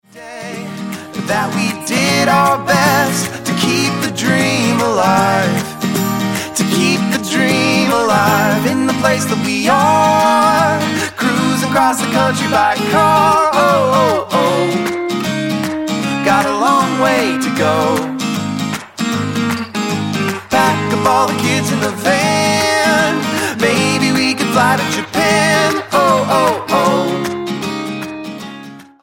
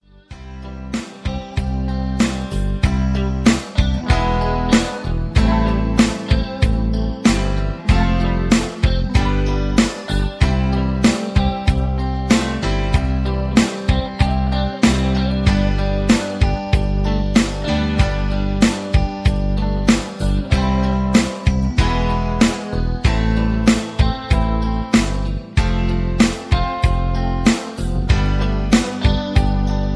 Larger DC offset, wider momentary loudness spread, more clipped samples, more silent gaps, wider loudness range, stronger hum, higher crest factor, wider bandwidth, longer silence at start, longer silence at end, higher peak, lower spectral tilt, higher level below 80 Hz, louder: first, 0.1% vs under 0.1%; about the same, 8 LU vs 6 LU; neither; neither; about the same, 3 LU vs 1 LU; neither; about the same, 14 dB vs 16 dB; first, 17 kHz vs 11 kHz; second, 0.15 s vs 0.3 s; first, 0.2 s vs 0 s; about the same, 0 dBFS vs 0 dBFS; second, -4 dB/octave vs -6 dB/octave; second, -54 dBFS vs -20 dBFS; first, -14 LUFS vs -18 LUFS